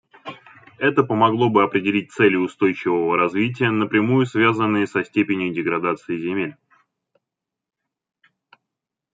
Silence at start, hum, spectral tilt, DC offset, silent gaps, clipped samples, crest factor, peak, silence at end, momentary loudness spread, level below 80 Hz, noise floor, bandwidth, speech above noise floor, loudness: 0.25 s; none; -7.5 dB/octave; under 0.1%; none; under 0.1%; 18 dB; -2 dBFS; 2.6 s; 8 LU; -66 dBFS; -84 dBFS; 7.8 kHz; 65 dB; -20 LUFS